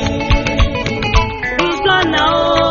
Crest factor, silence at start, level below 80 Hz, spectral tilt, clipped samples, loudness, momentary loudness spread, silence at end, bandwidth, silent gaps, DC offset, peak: 14 dB; 0 s; -22 dBFS; -3 dB/octave; under 0.1%; -14 LUFS; 4 LU; 0 s; 7.4 kHz; none; under 0.1%; 0 dBFS